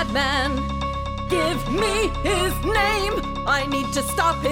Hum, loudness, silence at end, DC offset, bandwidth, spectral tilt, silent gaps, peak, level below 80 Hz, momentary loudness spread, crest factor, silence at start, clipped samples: none; -22 LUFS; 0 s; under 0.1%; 17 kHz; -4 dB/octave; none; -6 dBFS; -32 dBFS; 5 LU; 16 dB; 0 s; under 0.1%